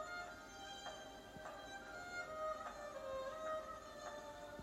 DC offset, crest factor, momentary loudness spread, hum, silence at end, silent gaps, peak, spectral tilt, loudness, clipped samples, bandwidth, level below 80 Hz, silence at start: under 0.1%; 16 dB; 7 LU; none; 0 s; none; -34 dBFS; -3 dB/octave; -49 LUFS; under 0.1%; 16 kHz; -70 dBFS; 0 s